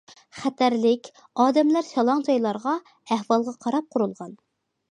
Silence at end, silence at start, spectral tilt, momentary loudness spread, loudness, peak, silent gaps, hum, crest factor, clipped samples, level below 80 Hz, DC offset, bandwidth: 0.55 s; 0.35 s; -5.5 dB/octave; 10 LU; -24 LUFS; -6 dBFS; none; none; 18 dB; under 0.1%; -76 dBFS; under 0.1%; 10 kHz